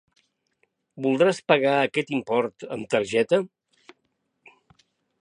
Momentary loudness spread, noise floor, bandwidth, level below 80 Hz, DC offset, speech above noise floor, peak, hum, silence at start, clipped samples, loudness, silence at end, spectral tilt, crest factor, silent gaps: 10 LU; -75 dBFS; 10.5 kHz; -70 dBFS; under 0.1%; 52 dB; -2 dBFS; none; 0.95 s; under 0.1%; -23 LUFS; 1.75 s; -5 dB/octave; 24 dB; none